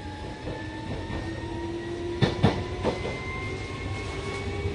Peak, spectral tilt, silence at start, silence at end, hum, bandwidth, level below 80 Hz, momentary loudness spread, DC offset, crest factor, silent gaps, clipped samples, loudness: -8 dBFS; -6.5 dB/octave; 0 s; 0 s; none; 11.5 kHz; -40 dBFS; 10 LU; under 0.1%; 22 dB; none; under 0.1%; -31 LUFS